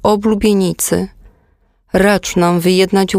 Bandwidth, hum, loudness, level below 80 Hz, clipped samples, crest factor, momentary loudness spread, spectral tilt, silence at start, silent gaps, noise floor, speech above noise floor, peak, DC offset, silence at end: 16 kHz; none; -13 LUFS; -38 dBFS; under 0.1%; 14 dB; 7 LU; -5 dB/octave; 0.05 s; none; -56 dBFS; 43 dB; 0 dBFS; under 0.1%; 0 s